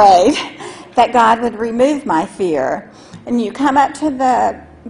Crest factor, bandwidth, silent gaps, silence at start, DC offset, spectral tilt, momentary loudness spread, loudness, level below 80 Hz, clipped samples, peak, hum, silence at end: 14 dB; 11 kHz; none; 0 s; under 0.1%; -4.5 dB/octave; 10 LU; -15 LUFS; -48 dBFS; under 0.1%; 0 dBFS; none; 0 s